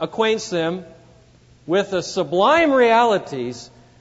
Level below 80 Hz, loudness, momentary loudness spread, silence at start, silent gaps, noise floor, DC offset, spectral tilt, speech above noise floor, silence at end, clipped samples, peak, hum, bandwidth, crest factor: -58 dBFS; -18 LUFS; 14 LU; 0 s; none; -51 dBFS; under 0.1%; -4.5 dB/octave; 32 dB; 0.35 s; under 0.1%; -4 dBFS; none; 8 kHz; 16 dB